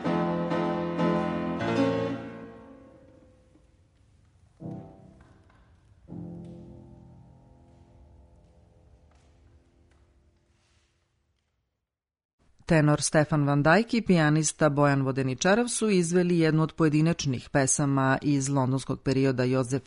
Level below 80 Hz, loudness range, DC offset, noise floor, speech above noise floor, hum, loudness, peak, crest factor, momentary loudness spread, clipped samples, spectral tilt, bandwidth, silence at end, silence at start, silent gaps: -56 dBFS; 24 LU; under 0.1%; -87 dBFS; 63 dB; none; -25 LUFS; -8 dBFS; 20 dB; 19 LU; under 0.1%; -5.5 dB/octave; 11 kHz; 0.05 s; 0 s; 12.25-12.38 s